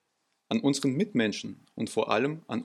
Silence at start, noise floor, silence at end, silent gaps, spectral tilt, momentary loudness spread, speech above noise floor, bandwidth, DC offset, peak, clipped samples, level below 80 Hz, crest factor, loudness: 0.5 s; -77 dBFS; 0 s; none; -5 dB/octave; 10 LU; 48 dB; 13.5 kHz; under 0.1%; -10 dBFS; under 0.1%; -76 dBFS; 20 dB; -29 LUFS